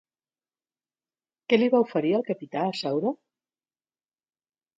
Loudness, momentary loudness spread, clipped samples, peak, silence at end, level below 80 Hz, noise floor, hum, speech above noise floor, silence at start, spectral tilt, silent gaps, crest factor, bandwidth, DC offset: -25 LUFS; 10 LU; under 0.1%; -6 dBFS; 1.65 s; -76 dBFS; under -90 dBFS; none; over 66 dB; 1.5 s; -6.5 dB/octave; none; 22 dB; 7.8 kHz; under 0.1%